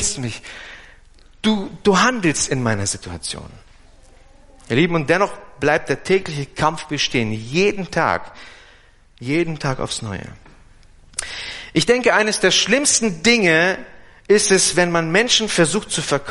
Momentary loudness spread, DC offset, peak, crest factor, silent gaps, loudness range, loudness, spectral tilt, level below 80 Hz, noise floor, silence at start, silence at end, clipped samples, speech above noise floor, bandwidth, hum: 14 LU; under 0.1%; -2 dBFS; 18 dB; none; 8 LU; -18 LUFS; -3 dB/octave; -46 dBFS; -49 dBFS; 0 s; 0 s; under 0.1%; 31 dB; 11.5 kHz; none